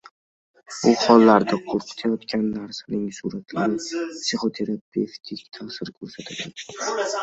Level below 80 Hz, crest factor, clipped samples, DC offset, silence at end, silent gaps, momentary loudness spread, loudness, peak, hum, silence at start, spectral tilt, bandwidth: -64 dBFS; 22 dB; under 0.1%; under 0.1%; 0 s; 4.81-4.92 s; 19 LU; -22 LUFS; -2 dBFS; none; 0.7 s; -4.5 dB/octave; 8.2 kHz